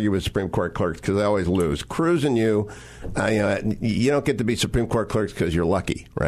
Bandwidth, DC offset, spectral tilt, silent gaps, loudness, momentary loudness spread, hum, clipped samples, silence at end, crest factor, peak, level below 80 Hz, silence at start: 13.5 kHz; under 0.1%; -6 dB/octave; none; -23 LUFS; 5 LU; none; under 0.1%; 0 s; 14 dB; -8 dBFS; -40 dBFS; 0 s